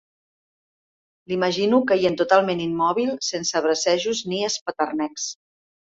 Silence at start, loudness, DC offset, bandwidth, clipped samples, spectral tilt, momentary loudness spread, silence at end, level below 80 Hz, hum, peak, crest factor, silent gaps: 1.3 s; -22 LUFS; under 0.1%; 8 kHz; under 0.1%; -3.5 dB/octave; 9 LU; 0.6 s; -64 dBFS; none; -4 dBFS; 20 dB; 4.61-4.66 s